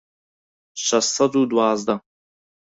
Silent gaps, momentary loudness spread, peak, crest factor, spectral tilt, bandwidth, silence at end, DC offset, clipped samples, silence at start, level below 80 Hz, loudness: none; 9 LU; -4 dBFS; 18 dB; -3 dB/octave; 8.2 kHz; 0.7 s; under 0.1%; under 0.1%; 0.75 s; -66 dBFS; -20 LUFS